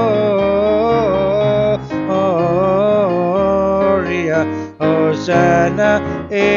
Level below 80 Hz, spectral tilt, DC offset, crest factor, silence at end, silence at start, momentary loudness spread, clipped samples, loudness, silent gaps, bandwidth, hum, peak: -40 dBFS; -7 dB/octave; under 0.1%; 12 dB; 0 s; 0 s; 5 LU; under 0.1%; -15 LUFS; none; 7.2 kHz; none; -2 dBFS